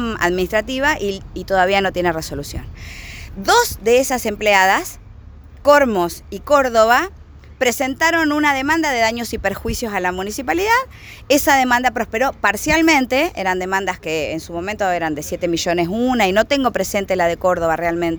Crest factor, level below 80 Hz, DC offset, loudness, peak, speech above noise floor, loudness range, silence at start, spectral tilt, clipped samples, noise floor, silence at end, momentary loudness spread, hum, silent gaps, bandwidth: 18 dB; -38 dBFS; under 0.1%; -17 LUFS; 0 dBFS; 21 dB; 3 LU; 0 s; -3.5 dB/octave; under 0.1%; -39 dBFS; 0 s; 12 LU; none; none; over 20 kHz